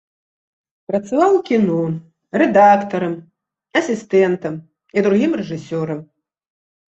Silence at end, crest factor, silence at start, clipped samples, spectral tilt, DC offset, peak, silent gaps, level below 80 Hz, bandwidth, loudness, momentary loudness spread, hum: 0.9 s; 16 dB; 0.9 s; under 0.1%; -7 dB/octave; under 0.1%; -2 dBFS; none; -62 dBFS; 8.2 kHz; -17 LUFS; 14 LU; none